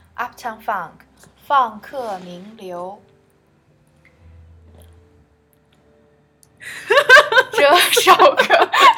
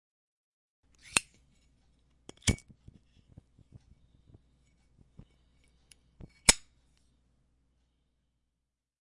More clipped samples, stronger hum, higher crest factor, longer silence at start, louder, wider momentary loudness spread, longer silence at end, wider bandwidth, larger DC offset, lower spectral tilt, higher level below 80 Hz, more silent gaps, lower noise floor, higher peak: first, 0.1% vs under 0.1%; second, none vs 60 Hz at -65 dBFS; second, 18 dB vs 38 dB; second, 0.2 s vs 1.15 s; first, -13 LUFS vs -29 LUFS; first, 25 LU vs 10 LU; second, 0 s vs 2.45 s; first, over 20 kHz vs 11.5 kHz; neither; about the same, -1 dB/octave vs -1.5 dB/octave; second, -58 dBFS vs -52 dBFS; neither; second, -57 dBFS vs -86 dBFS; about the same, 0 dBFS vs -2 dBFS